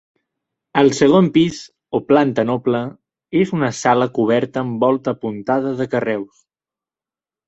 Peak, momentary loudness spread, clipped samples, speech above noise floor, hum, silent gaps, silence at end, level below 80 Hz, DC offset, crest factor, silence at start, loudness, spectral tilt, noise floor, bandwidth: -2 dBFS; 11 LU; under 0.1%; over 73 dB; none; none; 1.25 s; -58 dBFS; under 0.1%; 16 dB; 0.75 s; -18 LUFS; -6 dB/octave; under -90 dBFS; 8.2 kHz